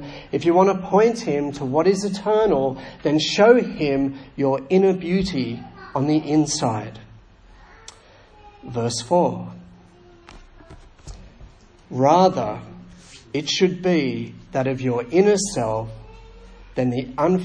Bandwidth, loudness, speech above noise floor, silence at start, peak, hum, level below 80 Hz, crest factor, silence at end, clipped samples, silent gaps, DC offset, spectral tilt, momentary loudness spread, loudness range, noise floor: 10.5 kHz; -20 LUFS; 29 dB; 0 s; -2 dBFS; none; -48 dBFS; 20 dB; 0 s; under 0.1%; none; under 0.1%; -5.5 dB/octave; 13 LU; 8 LU; -49 dBFS